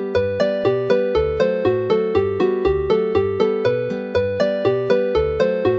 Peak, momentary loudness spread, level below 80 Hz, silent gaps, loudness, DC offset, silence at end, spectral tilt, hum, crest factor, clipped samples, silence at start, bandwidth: -4 dBFS; 2 LU; -38 dBFS; none; -19 LUFS; under 0.1%; 0 s; -7.5 dB/octave; none; 14 dB; under 0.1%; 0 s; 7.2 kHz